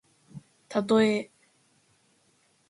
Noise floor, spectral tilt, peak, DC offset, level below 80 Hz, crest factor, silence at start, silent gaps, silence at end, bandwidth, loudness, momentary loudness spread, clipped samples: -67 dBFS; -5.5 dB/octave; -10 dBFS; under 0.1%; -74 dBFS; 20 dB; 0.35 s; none; 1.45 s; 11 kHz; -26 LUFS; 27 LU; under 0.1%